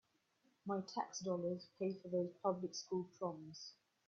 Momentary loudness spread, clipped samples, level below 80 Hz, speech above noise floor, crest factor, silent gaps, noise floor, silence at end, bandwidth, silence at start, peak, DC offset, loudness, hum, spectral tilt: 12 LU; under 0.1%; -86 dBFS; 36 dB; 20 dB; none; -79 dBFS; 0.35 s; 7.4 kHz; 0.65 s; -24 dBFS; under 0.1%; -44 LUFS; none; -6 dB/octave